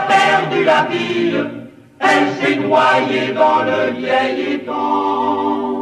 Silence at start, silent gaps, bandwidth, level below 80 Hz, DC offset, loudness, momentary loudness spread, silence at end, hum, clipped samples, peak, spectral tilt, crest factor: 0 s; none; 12 kHz; -66 dBFS; under 0.1%; -15 LUFS; 7 LU; 0 s; none; under 0.1%; 0 dBFS; -5 dB/octave; 16 dB